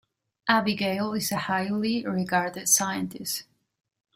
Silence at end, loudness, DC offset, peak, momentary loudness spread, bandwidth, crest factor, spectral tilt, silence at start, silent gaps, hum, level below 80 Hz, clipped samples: 0.75 s; -26 LUFS; under 0.1%; -8 dBFS; 10 LU; 16 kHz; 20 dB; -3 dB/octave; 0.45 s; none; none; -66 dBFS; under 0.1%